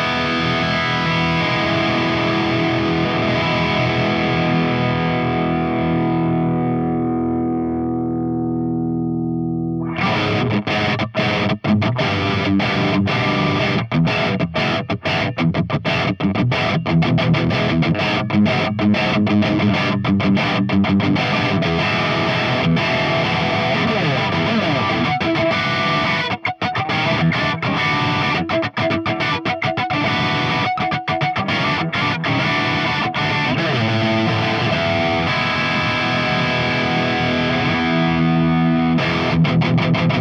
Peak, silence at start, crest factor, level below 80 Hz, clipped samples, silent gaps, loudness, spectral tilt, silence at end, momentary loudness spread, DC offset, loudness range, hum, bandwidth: -6 dBFS; 0 s; 12 dB; -46 dBFS; under 0.1%; none; -18 LUFS; -6.5 dB/octave; 0 s; 3 LU; under 0.1%; 2 LU; none; 7.6 kHz